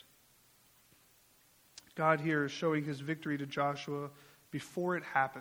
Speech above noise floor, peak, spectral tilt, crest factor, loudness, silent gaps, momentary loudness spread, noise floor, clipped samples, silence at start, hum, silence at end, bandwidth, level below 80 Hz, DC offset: 32 dB; -14 dBFS; -6 dB/octave; 24 dB; -35 LUFS; none; 15 LU; -66 dBFS; under 0.1%; 1.95 s; none; 0 s; over 20 kHz; -78 dBFS; under 0.1%